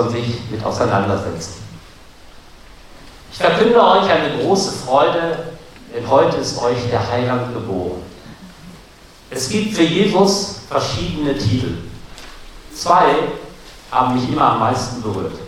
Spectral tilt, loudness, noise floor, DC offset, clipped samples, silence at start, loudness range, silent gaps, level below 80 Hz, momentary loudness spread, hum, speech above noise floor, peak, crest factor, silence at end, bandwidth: -5 dB/octave; -17 LUFS; -43 dBFS; under 0.1%; under 0.1%; 0 s; 6 LU; none; -42 dBFS; 22 LU; none; 26 dB; 0 dBFS; 18 dB; 0 s; 16 kHz